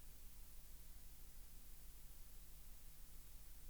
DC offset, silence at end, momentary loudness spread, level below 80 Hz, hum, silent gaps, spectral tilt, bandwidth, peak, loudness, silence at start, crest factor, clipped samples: 0.1%; 0 s; 0 LU; -58 dBFS; none; none; -3 dB/octave; over 20 kHz; -44 dBFS; -61 LUFS; 0 s; 12 dB; under 0.1%